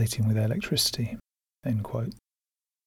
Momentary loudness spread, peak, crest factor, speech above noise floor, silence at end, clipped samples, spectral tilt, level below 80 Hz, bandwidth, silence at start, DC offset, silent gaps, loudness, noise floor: 12 LU; -12 dBFS; 16 dB; over 63 dB; 0.7 s; under 0.1%; -4.5 dB/octave; -54 dBFS; 17 kHz; 0 s; under 0.1%; none; -28 LUFS; under -90 dBFS